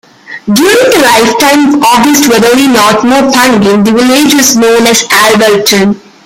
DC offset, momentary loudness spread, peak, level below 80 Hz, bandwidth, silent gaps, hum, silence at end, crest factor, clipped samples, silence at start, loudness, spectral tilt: under 0.1%; 3 LU; 0 dBFS; -42 dBFS; over 20 kHz; none; none; 0.25 s; 6 dB; 0.5%; 0.3 s; -5 LUFS; -3 dB/octave